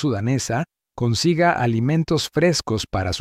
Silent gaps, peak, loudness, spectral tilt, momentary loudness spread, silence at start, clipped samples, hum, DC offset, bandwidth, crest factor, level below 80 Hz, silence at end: none; -6 dBFS; -21 LUFS; -5 dB/octave; 7 LU; 0 s; under 0.1%; none; under 0.1%; 15.5 kHz; 16 dB; -46 dBFS; 0 s